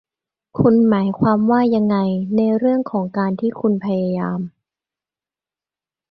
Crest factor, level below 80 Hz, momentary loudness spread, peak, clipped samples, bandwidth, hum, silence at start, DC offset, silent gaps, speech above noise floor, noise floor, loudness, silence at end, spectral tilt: 16 dB; -52 dBFS; 8 LU; -2 dBFS; under 0.1%; 5 kHz; none; 0.55 s; under 0.1%; none; over 73 dB; under -90 dBFS; -18 LUFS; 1.6 s; -11 dB/octave